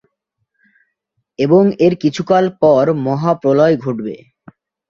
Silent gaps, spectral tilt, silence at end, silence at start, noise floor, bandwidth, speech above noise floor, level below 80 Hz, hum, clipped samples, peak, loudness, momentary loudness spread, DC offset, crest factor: none; -8 dB/octave; 0.75 s; 1.4 s; -72 dBFS; 7.6 kHz; 58 dB; -56 dBFS; none; under 0.1%; 0 dBFS; -14 LUFS; 11 LU; under 0.1%; 14 dB